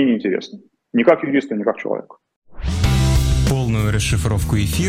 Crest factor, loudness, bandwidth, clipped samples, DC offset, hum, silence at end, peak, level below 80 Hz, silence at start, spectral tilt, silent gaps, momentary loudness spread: 18 dB; -19 LUFS; 16.5 kHz; under 0.1%; under 0.1%; none; 0 s; 0 dBFS; -26 dBFS; 0 s; -6 dB/octave; 2.36-2.42 s; 10 LU